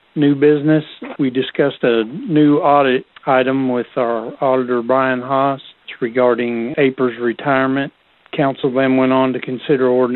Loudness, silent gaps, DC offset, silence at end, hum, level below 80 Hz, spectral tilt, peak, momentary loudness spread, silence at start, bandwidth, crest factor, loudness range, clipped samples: -16 LUFS; none; under 0.1%; 0 s; none; -60 dBFS; -11 dB/octave; 0 dBFS; 8 LU; 0.15 s; 4.2 kHz; 16 dB; 2 LU; under 0.1%